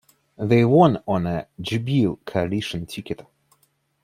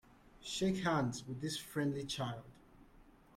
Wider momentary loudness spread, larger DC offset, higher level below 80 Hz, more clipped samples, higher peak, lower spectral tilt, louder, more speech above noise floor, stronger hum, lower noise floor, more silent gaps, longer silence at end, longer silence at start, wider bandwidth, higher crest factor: first, 16 LU vs 9 LU; neither; first, -54 dBFS vs -64 dBFS; neither; first, -2 dBFS vs -22 dBFS; first, -7.5 dB/octave vs -5 dB/octave; first, -21 LUFS vs -38 LUFS; first, 45 dB vs 25 dB; neither; about the same, -66 dBFS vs -63 dBFS; neither; first, 0.8 s vs 0.25 s; about the same, 0.4 s vs 0.35 s; about the same, 15 kHz vs 16 kHz; about the same, 20 dB vs 18 dB